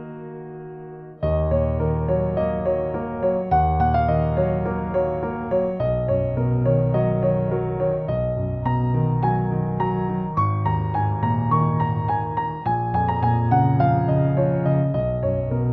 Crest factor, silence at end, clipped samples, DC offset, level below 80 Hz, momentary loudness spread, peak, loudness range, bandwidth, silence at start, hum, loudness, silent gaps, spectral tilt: 16 dB; 0 s; under 0.1%; under 0.1%; -36 dBFS; 6 LU; -6 dBFS; 2 LU; 4.5 kHz; 0 s; none; -22 LUFS; none; -12 dB/octave